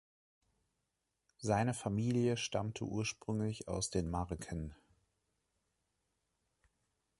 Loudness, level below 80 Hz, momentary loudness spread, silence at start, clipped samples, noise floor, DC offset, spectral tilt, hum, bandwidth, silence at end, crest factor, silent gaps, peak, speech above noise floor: -38 LUFS; -56 dBFS; 9 LU; 1.4 s; under 0.1%; -86 dBFS; under 0.1%; -5.5 dB/octave; none; 11.5 kHz; 2.45 s; 22 dB; none; -18 dBFS; 49 dB